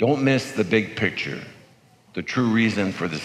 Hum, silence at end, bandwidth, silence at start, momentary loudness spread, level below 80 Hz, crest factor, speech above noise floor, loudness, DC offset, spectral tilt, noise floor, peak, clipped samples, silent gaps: none; 0 s; 13 kHz; 0 s; 14 LU; -64 dBFS; 18 dB; 32 dB; -23 LUFS; under 0.1%; -6 dB/octave; -55 dBFS; -6 dBFS; under 0.1%; none